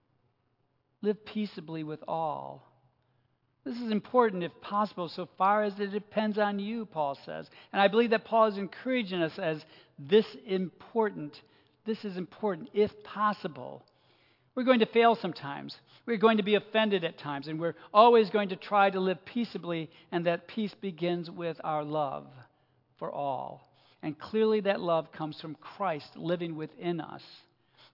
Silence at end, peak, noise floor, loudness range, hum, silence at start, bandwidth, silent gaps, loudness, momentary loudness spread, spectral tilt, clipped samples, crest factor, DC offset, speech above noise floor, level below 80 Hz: 0.55 s; -8 dBFS; -74 dBFS; 8 LU; none; 1 s; 5.8 kHz; none; -30 LUFS; 15 LU; -8 dB/octave; under 0.1%; 24 dB; under 0.1%; 45 dB; -80 dBFS